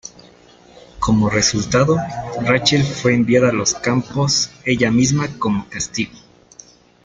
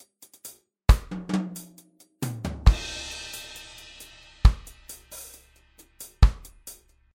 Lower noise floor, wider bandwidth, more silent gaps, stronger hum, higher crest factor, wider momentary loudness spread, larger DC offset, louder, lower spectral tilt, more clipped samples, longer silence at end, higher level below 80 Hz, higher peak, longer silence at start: second, -47 dBFS vs -57 dBFS; second, 9.6 kHz vs 16.5 kHz; neither; neither; second, 16 dB vs 22 dB; second, 9 LU vs 21 LU; neither; first, -17 LUFS vs -26 LUFS; about the same, -4.5 dB/octave vs -5 dB/octave; neither; first, 0.85 s vs 0.45 s; second, -42 dBFS vs -28 dBFS; about the same, -2 dBFS vs -4 dBFS; second, 0.05 s vs 0.45 s